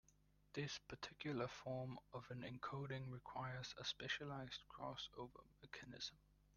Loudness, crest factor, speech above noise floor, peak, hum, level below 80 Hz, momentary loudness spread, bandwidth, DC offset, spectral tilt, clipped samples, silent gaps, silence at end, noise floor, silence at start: -51 LUFS; 20 dB; 25 dB; -32 dBFS; 50 Hz at -70 dBFS; -74 dBFS; 9 LU; 7.2 kHz; under 0.1%; -4.5 dB/octave; under 0.1%; none; 0 s; -76 dBFS; 0.1 s